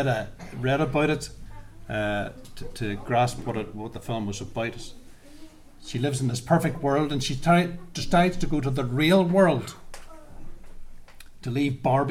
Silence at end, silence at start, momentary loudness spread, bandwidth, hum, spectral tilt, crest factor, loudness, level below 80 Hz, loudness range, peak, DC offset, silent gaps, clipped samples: 0 s; 0 s; 19 LU; 16 kHz; none; -6 dB/octave; 18 dB; -25 LUFS; -42 dBFS; 7 LU; -8 dBFS; under 0.1%; none; under 0.1%